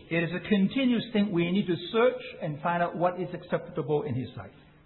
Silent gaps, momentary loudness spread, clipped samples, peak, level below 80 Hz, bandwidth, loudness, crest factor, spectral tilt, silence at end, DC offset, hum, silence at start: none; 11 LU; under 0.1%; -12 dBFS; -62 dBFS; 4.3 kHz; -28 LUFS; 16 dB; -11 dB/octave; 0.35 s; under 0.1%; none; 0 s